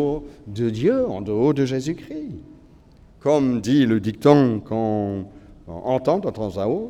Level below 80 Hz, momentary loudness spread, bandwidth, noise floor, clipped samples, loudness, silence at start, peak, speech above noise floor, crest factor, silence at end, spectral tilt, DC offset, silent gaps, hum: -50 dBFS; 16 LU; 12.5 kHz; -49 dBFS; under 0.1%; -21 LUFS; 0 s; 0 dBFS; 29 dB; 22 dB; 0 s; -7.5 dB/octave; under 0.1%; none; none